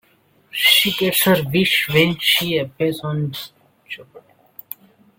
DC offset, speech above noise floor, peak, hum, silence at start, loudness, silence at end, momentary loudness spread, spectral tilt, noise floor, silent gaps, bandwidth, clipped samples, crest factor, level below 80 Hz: under 0.1%; 40 dB; -2 dBFS; none; 0.55 s; -16 LUFS; 1 s; 22 LU; -3.5 dB/octave; -57 dBFS; none; 17 kHz; under 0.1%; 18 dB; -56 dBFS